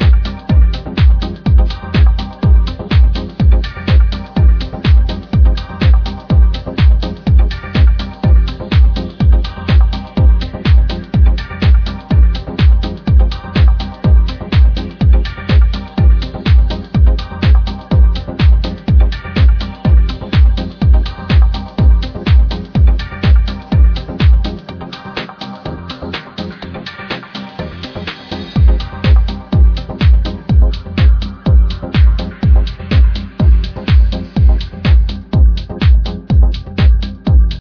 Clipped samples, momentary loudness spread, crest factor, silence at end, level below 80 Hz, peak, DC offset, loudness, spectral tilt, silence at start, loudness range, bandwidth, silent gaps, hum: under 0.1%; 10 LU; 10 dB; 0 s; -12 dBFS; 0 dBFS; under 0.1%; -13 LUFS; -8.5 dB/octave; 0 s; 3 LU; 5.4 kHz; none; none